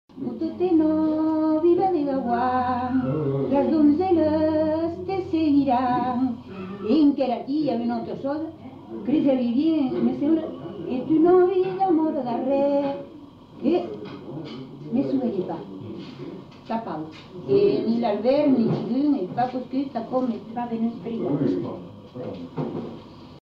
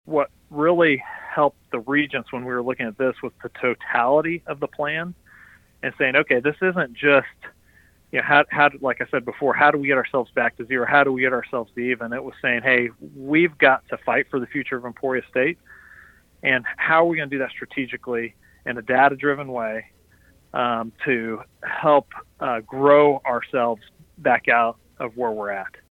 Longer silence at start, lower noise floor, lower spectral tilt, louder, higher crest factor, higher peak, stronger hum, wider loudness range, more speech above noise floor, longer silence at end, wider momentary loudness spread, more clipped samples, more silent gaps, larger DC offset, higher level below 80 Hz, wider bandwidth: about the same, 0.15 s vs 0.05 s; second, -44 dBFS vs -56 dBFS; first, -9.5 dB/octave vs -7 dB/octave; about the same, -23 LUFS vs -21 LUFS; second, 14 dB vs 20 dB; second, -8 dBFS vs -2 dBFS; neither; first, 7 LU vs 4 LU; second, 21 dB vs 34 dB; second, 0.05 s vs 0.25 s; first, 16 LU vs 13 LU; neither; neither; neither; about the same, -60 dBFS vs -60 dBFS; about the same, 5.6 kHz vs 5.2 kHz